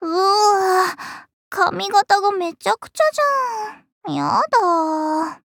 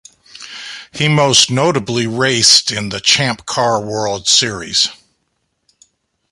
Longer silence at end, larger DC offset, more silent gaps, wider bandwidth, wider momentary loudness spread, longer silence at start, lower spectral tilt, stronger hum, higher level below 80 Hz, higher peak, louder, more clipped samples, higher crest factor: second, 0.1 s vs 1.4 s; neither; first, 1.33-1.51 s, 3.92-4.01 s vs none; first, 19.5 kHz vs 16 kHz; second, 14 LU vs 19 LU; second, 0 s vs 0.35 s; about the same, -3 dB/octave vs -2.5 dB/octave; neither; second, -68 dBFS vs -50 dBFS; about the same, -2 dBFS vs 0 dBFS; second, -18 LUFS vs -13 LUFS; neither; about the same, 16 dB vs 16 dB